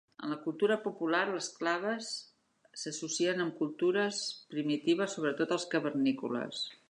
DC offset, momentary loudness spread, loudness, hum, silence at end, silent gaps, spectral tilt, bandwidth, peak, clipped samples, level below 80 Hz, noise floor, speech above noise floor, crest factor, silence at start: under 0.1%; 8 LU; -33 LUFS; none; 0.15 s; none; -3.5 dB/octave; 11 kHz; -16 dBFS; under 0.1%; -86 dBFS; -59 dBFS; 26 dB; 18 dB; 0.2 s